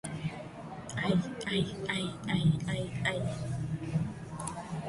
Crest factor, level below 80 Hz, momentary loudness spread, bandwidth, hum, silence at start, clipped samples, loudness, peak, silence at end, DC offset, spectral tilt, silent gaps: 18 dB; -54 dBFS; 10 LU; 11.5 kHz; none; 0.05 s; under 0.1%; -33 LUFS; -16 dBFS; 0 s; under 0.1%; -5.5 dB/octave; none